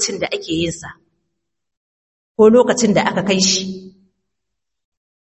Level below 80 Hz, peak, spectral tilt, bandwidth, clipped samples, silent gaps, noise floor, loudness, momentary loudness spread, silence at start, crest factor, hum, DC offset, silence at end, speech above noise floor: -52 dBFS; 0 dBFS; -3.5 dB/octave; 8.6 kHz; under 0.1%; 1.77-2.35 s; -81 dBFS; -15 LUFS; 20 LU; 0 s; 18 dB; none; under 0.1%; 1.4 s; 66 dB